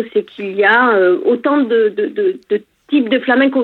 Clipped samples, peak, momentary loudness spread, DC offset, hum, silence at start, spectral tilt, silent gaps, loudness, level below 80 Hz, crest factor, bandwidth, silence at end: under 0.1%; 0 dBFS; 10 LU; under 0.1%; none; 0 s; -7 dB/octave; none; -14 LUFS; -72 dBFS; 14 dB; 4.4 kHz; 0 s